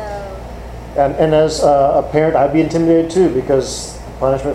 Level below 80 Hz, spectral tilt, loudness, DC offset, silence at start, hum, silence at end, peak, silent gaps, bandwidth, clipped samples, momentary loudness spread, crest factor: -34 dBFS; -6 dB/octave; -14 LUFS; under 0.1%; 0 s; none; 0 s; 0 dBFS; none; 13 kHz; under 0.1%; 16 LU; 14 dB